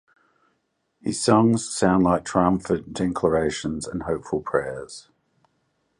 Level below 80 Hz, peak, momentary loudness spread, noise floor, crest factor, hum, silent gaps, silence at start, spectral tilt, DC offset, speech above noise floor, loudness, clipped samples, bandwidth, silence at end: -48 dBFS; -4 dBFS; 14 LU; -73 dBFS; 20 dB; none; none; 1.05 s; -5.5 dB/octave; under 0.1%; 50 dB; -23 LUFS; under 0.1%; 11 kHz; 1 s